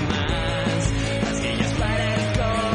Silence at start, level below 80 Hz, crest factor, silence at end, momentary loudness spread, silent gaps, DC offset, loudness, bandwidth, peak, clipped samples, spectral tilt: 0 s; -32 dBFS; 14 dB; 0 s; 1 LU; none; under 0.1%; -23 LUFS; 10.5 kHz; -8 dBFS; under 0.1%; -5 dB/octave